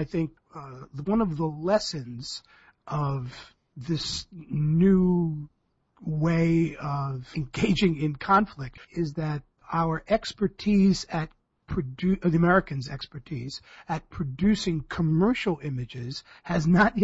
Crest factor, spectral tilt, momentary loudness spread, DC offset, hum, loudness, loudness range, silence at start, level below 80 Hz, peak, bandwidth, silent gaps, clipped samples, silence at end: 18 dB; -6.5 dB/octave; 16 LU; under 0.1%; none; -27 LUFS; 4 LU; 0 s; -48 dBFS; -8 dBFS; 8 kHz; none; under 0.1%; 0 s